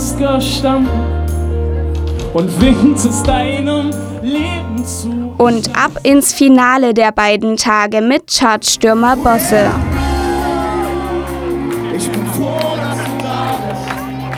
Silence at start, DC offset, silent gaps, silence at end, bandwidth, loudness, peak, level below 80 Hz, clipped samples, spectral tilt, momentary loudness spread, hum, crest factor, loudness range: 0 s; under 0.1%; none; 0 s; 18 kHz; -13 LUFS; 0 dBFS; -26 dBFS; under 0.1%; -4.5 dB/octave; 9 LU; none; 14 dB; 7 LU